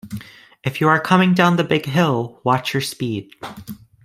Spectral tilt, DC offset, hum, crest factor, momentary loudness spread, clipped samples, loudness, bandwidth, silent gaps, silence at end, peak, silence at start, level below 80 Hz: -6 dB/octave; under 0.1%; none; 18 dB; 20 LU; under 0.1%; -18 LUFS; 16 kHz; none; 0.3 s; -2 dBFS; 0.05 s; -56 dBFS